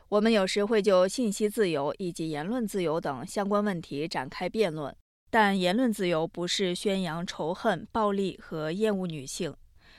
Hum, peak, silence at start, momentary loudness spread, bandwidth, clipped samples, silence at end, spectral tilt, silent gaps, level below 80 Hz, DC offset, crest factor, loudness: none; -10 dBFS; 0.1 s; 10 LU; 15.5 kHz; under 0.1%; 0.45 s; -5 dB/octave; 5.01-5.27 s; -58 dBFS; under 0.1%; 18 dB; -28 LUFS